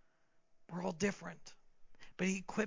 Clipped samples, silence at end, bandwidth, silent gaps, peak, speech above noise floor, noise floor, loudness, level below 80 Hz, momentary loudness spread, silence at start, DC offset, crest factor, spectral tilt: under 0.1%; 0 s; 7.6 kHz; none; -20 dBFS; 31 dB; -70 dBFS; -40 LUFS; -70 dBFS; 19 LU; 0.55 s; under 0.1%; 20 dB; -5 dB/octave